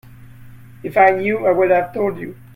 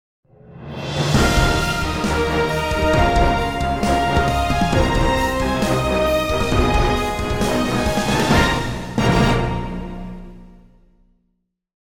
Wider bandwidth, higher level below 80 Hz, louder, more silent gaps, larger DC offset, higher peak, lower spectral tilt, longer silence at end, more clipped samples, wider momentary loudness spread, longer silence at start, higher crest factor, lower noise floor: second, 16 kHz vs 19 kHz; second, -52 dBFS vs -26 dBFS; about the same, -16 LUFS vs -18 LUFS; neither; neither; about the same, 0 dBFS vs -2 dBFS; first, -8 dB/octave vs -5.5 dB/octave; about the same, 0.2 s vs 0.2 s; neither; about the same, 12 LU vs 10 LU; second, 0.05 s vs 0.25 s; about the same, 18 dB vs 18 dB; second, -39 dBFS vs -70 dBFS